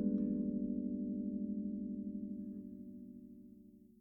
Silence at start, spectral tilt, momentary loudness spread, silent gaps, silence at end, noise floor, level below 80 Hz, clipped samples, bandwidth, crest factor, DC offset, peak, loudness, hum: 0 s; -13 dB/octave; 20 LU; none; 0.15 s; -60 dBFS; -66 dBFS; under 0.1%; 1.3 kHz; 16 dB; under 0.1%; -26 dBFS; -41 LUFS; none